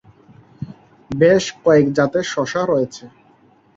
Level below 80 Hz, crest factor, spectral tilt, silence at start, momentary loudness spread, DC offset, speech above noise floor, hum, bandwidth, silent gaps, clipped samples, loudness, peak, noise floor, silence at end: -54 dBFS; 18 dB; -5.5 dB/octave; 0.6 s; 21 LU; under 0.1%; 36 dB; none; 7.8 kHz; none; under 0.1%; -17 LUFS; -2 dBFS; -53 dBFS; 0.7 s